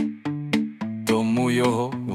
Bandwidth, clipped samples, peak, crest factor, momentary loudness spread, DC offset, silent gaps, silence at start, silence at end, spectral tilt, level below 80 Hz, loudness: 15.5 kHz; under 0.1%; -8 dBFS; 16 dB; 8 LU; under 0.1%; none; 0 s; 0 s; -6 dB/octave; -68 dBFS; -24 LUFS